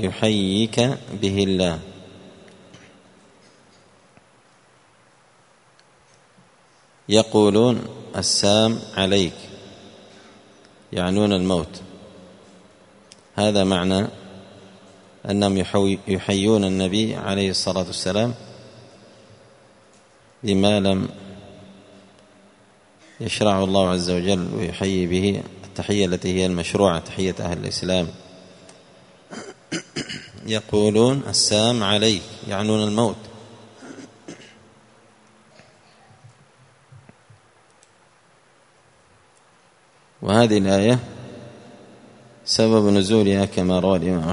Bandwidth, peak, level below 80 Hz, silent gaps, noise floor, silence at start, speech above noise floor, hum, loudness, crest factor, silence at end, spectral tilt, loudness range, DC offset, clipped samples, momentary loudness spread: 11 kHz; 0 dBFS; -54 dBFS; none; -56 dBFS; 0 s; 36 dB; none; -20 LUFS; 24 dB; 0 s; -5 dB/octave; 7 LU; under 0.1%; under 0.1%; 23 LU